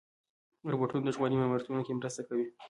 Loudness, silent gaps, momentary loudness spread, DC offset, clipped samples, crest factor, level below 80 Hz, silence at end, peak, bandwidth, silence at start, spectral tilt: -33 LUFS; none; 6 LU; under 0.1%; under 0.1%; 16 dB; -70 dBFS; 0 s; -18 dBFS; 11.5 kHz; 0.65 s; -6.5 dB/octave